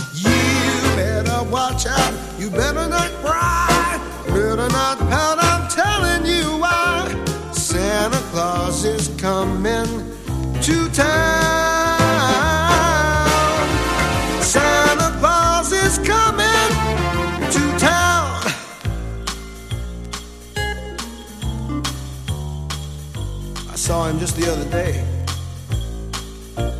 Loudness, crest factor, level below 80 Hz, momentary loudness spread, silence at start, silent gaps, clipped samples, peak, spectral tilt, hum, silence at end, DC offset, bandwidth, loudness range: -18 LUFS; 18 dB; -30 dBFS; 13 LU; 0 s; none; under 0.1%; 0 dBFS; -4 dB/octave; none; 0 s; under 0.1%; 15.5 kHz; 11 LU